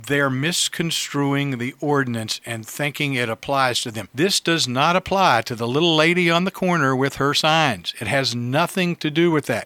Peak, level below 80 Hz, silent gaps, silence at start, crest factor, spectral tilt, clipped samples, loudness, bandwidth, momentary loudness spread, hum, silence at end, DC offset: -2 dBFS; -58 dBFS; none; 0 s; 20 dB; -4 dB/octave; under 0.1%; -20 LUFS; 19 kHz; 8 LU; none; 0 s; under 0.1%